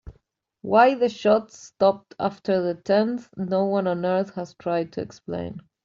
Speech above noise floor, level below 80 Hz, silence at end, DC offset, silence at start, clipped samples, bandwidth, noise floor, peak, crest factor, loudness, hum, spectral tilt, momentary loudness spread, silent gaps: 43 dB; -58 dBFS; 0.25 s; under 0.1%; 0.05 s; under 0.1%; 7.6 kHz; -66 dBFS; -4 dBFS; 20 dB; -23 LUFS; none; -6.5 dB/octave; 14 LU; none